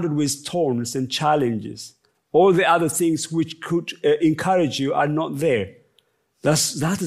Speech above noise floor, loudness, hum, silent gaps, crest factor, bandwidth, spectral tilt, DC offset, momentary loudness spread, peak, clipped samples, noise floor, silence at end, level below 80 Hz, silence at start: 44 dB; -21 LUFS; none; none; 16 dB; 15.5 kHz; -4.5 dB/octave; under 0.1%; 8 LU; -4 dBFS; under 0.1%; -64 dBFS; 0 s; -64 dBFS; 0 s